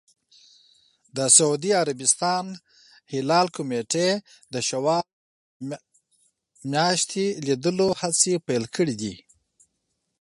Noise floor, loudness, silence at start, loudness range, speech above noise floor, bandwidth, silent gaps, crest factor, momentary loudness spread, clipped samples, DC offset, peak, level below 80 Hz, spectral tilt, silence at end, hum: -77 dBFS; -22 LUFS; 1.15 s; 5 LU; 53 dB; 11.5 kHz; 5.13-5.60 s; 24 dB; 17 LU; under 0.1%; under 0.1%; -2 dBFS; -68 dBFS; -3 dB/octave; 1.05 s; none